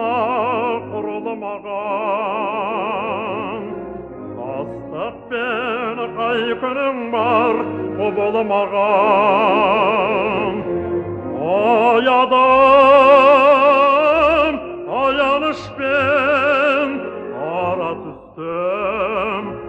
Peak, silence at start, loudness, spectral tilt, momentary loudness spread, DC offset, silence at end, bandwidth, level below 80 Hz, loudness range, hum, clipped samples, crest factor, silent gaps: -2 dBFS; 0 s; -16 LUFS; -6.5 dB/octave; 16 LU; under 0.1%; 0 s; 8.2 kHz; -50 dBFS; 12 LU; none; under 0.1%; 16 dB; none